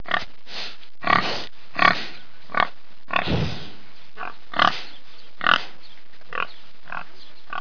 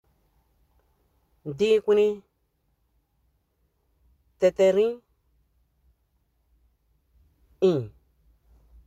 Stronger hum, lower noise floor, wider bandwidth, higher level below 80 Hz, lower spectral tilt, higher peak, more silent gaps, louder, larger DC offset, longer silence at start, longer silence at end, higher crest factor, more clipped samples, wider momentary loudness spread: neither; second, -51 dBFS vs -72 dBFS; second, 5.4 kHz vs 8.4 kHz; first, -50 dBFS vs -62 dBFS; second, -4.5 dB/octave vs -6.5 dB/octave; first, 0 dBFS vs -8 dBFS; neither; about the same, -24 LUFS vs -23 LUFS; first, 5% vs under 0.1%; second, 0.05 s vs 1.45 s; second, 0 s vs 1 s; first, 26 dB vs 20 dB; neither; second, 17 LU vs 20 LU